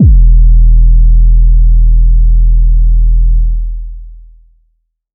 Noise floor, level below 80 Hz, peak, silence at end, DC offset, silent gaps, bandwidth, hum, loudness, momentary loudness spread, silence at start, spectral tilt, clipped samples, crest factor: -59 dBFS; -6 dBFS; 0 dBFS; 1 s; under 0.1%; none; 0.5 kHz; none; -10 LUFS; 9 LU; 0 s; -16 dB/octave; under 0.1%; 6 dB